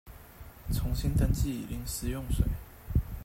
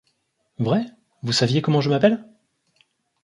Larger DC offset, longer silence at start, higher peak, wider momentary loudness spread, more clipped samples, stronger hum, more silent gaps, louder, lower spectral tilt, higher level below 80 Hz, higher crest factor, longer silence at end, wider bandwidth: neither; second, 0.05 s vs 0.6 s; second, -14 dBFS vs -4 dBFS; first, 18 LU vs 11 LU; neither; neither; neither; second, -32 LUFS vs -21 LUFS; about the same, -6 dB/octave vs -6 dB/octave; first, -34 dBFS vs -62 dBFS; about the same, 18 dB vs 18 dB; second, 0 s vs 1 s; first, 16.5 kHz vs 11.5 kHz